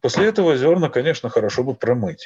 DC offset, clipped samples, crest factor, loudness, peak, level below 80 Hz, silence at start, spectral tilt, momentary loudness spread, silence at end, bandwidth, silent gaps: under 0.1%; under 0.1%; 14 dB; -19 LUFS; -6 dBFS; -58 dBFS; 0.05 s; -6 dB/octave; 5 LU; 0 s; 7.8 kHz; none